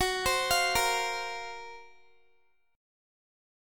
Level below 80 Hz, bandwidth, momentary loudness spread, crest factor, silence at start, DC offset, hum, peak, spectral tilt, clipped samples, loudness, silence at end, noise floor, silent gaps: -54 dBFS; 17.5 kHz; 17 LU; 20 dB; 0 s; under 0.1%; none; -12 dBFS; -1 dB/octave; under 0.1%; -28 LUFS; 1 s; -71 dBFS; none